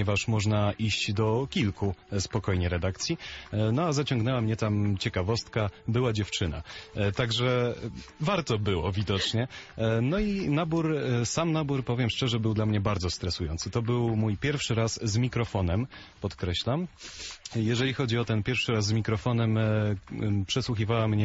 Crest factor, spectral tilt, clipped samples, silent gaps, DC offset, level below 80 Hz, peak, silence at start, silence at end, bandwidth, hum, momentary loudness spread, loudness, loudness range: 14 dB; -5.5 dB/octave; under 0.1%; none; under 0.1%; -44 dBFS; -14 dBFS; 0 s; 0 s; 8 kHz; none; 6 LU; -28 LUFS; 2 LU